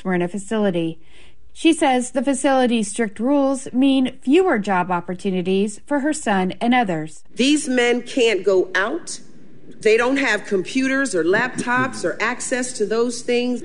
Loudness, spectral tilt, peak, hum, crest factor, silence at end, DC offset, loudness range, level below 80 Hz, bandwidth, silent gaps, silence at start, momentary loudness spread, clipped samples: -19 LUFS; -4.5 dB/octave; -4 dBFS; none; 16 dB; 0 s; 2%; 2 LU; -54 dBFS; 11.5 kHz; none; 0.05 s; 6 LU; under 0.1%